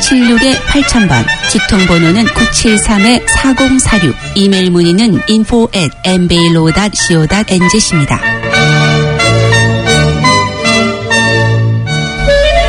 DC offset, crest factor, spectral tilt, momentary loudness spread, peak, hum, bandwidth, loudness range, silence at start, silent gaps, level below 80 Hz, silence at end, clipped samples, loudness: under 0.1%; 8 dB; -4.5 dB/octave; 4 LU; 0 dBFS; none; 11 kHz; 1 LU; 0 s; none; -24 dBFS; 0 s; 0.5%; -8 LUFS